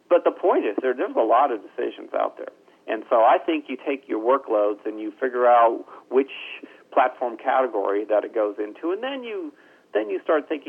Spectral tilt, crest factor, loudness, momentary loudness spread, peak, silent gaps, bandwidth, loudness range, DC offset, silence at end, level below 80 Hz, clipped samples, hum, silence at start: -5.5 dB/octave; 16 dB; -23 LUFS; 13 LU; -6 dBFS; none; 4.1 kHz; 3 LU; under 0.1%; 0.1 s; -90 dBFS; under 0.1%; none; 0.1 s